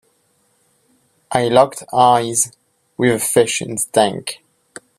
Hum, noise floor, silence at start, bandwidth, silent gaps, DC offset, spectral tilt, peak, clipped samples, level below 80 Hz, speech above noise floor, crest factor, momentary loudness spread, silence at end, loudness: none; -62 dBFS; 1.3 s; 16 kHz; none; under 0.1%; -3.5 dB/octave; 0 dBFS; under 0.1%; -58 dBFS; 46 dB; 18 dB; 13 LU; 0.65 s; -16 LUFS